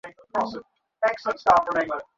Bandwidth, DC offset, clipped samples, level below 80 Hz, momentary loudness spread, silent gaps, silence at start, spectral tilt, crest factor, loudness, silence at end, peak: 7.8 kHz; under 0.1%; under 0.1%; -58 dBFS; 11 LU; none; 0.05 s; -4.5 dB/octave; 20 dB; -24 LUFS; 0.15 s; -4 dBFS